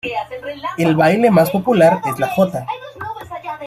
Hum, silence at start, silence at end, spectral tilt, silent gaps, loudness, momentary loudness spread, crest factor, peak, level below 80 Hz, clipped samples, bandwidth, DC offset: none; 0.05 s; 0 s; -6.5 dB/octave; none; -15 LUFS; 16 LU; 14 dB; -2 dBFS; -54 dBFS; under 0.1%; 15.5 kHz; under 0.1%